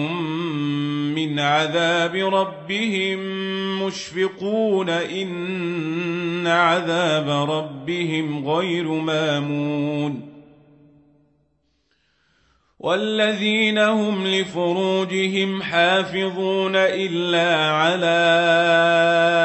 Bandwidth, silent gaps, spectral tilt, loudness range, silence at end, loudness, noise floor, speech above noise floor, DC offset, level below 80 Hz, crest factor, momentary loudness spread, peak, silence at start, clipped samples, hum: 8.4 kHz; none; -5 dB/octave; 8 LU; 0 s; -20 LUFS; -67 dBFS; 47 dB; under 0.1%; -68 dBFS; 16 dB; 9 LU; -4 dBFS; 0 s; under 0.1%; none